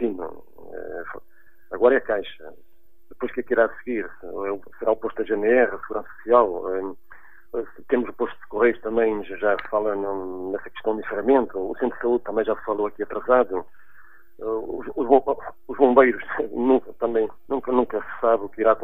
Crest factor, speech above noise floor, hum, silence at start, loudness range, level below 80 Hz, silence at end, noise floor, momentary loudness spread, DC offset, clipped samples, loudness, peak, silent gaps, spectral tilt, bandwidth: 22 dB; 38 dB; none; 0 s; 4 LU; -54 dBFS; 0 s; -61 dBFS; 14 LU; 1%; under 0.1%; -23 LUFS; 0 dBFS; none; -8.5 dB/octave; 15 kHz